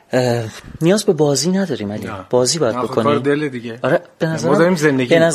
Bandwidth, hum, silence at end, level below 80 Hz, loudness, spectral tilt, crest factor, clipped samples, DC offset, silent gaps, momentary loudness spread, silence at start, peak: 15 kHz; none; 0 s; -52 dBFS; -17 LUFS; -5 dB/octave; 16 dB; under 0.1%; under 0.1%; none; 9 LU; 0.1 s; 0 dBFS